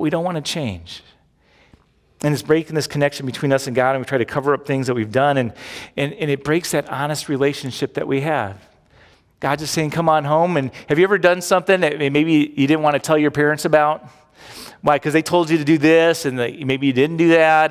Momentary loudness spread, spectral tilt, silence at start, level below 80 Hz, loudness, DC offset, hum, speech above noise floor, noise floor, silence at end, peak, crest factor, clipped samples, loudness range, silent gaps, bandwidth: 10 LU; -5.5 dB/octave; 0 s; -54 dBFS; -18 LUFS; under 0.1%; none; 38 dB; -56 dBFS; 0 s; -2 dBFS; 16 dB; under 0.1%; 6 LU; none; 16 kHz